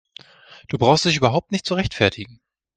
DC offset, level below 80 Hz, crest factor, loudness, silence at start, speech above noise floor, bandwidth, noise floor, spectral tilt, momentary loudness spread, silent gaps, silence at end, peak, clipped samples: under 0.1%; -48 dBFS; 22 dB; -19 LUFS; 0.7 s; 28 dB; 9.6 kHz; -48 dBFS; -5 dB/octave; 15 LU; none; 0.5 s; 0 dBFS; under 0.1%